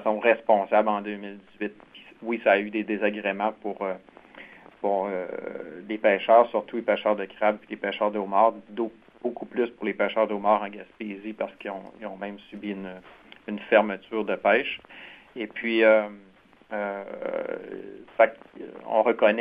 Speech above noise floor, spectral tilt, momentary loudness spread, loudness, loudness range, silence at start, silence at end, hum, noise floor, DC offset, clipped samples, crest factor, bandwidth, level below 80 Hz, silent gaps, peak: 22 dB; -8 dB/octave; 17 LU; -25 LUFS; 5 LU; 0 s; 0 s; none; -48 dBFS; under 0.1%; under 0.1%; 22 dB; 4.9 kHz; -70 dBFS; none; -4 dBFS